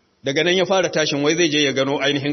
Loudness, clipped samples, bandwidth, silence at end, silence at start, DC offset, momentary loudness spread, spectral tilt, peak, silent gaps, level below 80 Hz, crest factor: -18 LUFS; under 0.1%; 6.4 kHz; 0 s; 0.25 s; under 0.1%; 3 LU; -3.5 dB/octave; -4 dBFS; none; -64 dBFS; 14 dB